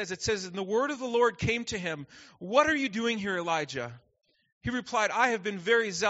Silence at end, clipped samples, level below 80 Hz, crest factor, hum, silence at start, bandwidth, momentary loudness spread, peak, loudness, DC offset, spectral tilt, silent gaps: 0 s; under 0.1%; -58 dBFS; 20 dB; none; 0 s; 8 kHz; 12 LU; -8 dBFS; -29 LUFS; under 0.1%; -2.5 dB/octave; 4.52-4.61 s